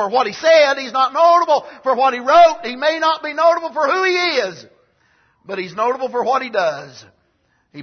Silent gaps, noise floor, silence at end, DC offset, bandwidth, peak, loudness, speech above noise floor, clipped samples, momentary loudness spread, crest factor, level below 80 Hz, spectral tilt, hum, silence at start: none; -63 dBFS; 0 s; under 0.1%; 6.6 kHz; -2 dBFS; -16 LUFS; 47 dB; under 0.1%; 9 LU; 14 dB; -60 dBFS; -3 dB/octave; none; 0 s